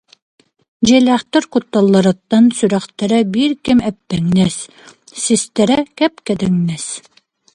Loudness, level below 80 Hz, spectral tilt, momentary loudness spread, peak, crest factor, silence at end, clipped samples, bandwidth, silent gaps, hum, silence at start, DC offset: -15 LUFS; -48 dBFS; -5 dB/octave; 10 LU; 0 dBFS; 16 dB; 0.55 s; under 0.1%; 11 kHz; none; none; 0.8 s; under 0.1%